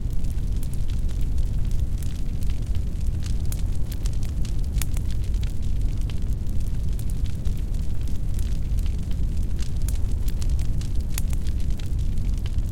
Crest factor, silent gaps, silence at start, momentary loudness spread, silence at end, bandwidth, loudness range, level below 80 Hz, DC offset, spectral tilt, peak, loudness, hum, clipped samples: 14 dB; none; 0 s; 2 LU; 0 s; 16.5 kHz; 1 LU; -24 dBFS; under 0.1%; -6 dB/octave; -6 dBFS; -29 LUFS; none; under 0.1%